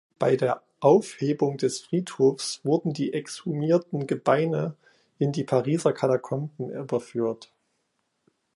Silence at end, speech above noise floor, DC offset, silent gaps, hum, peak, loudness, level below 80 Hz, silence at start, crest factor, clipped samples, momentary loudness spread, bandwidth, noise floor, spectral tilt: 1.1 s; 51 dB; under 0.1%; none; none; -6 dBFS; -26 LUFS; -72 dBFS; 0.2 s; 20 dB; under 0.1%; 9 LU; 11.5 kHz; -75 dBFS; -6.5 dB/octave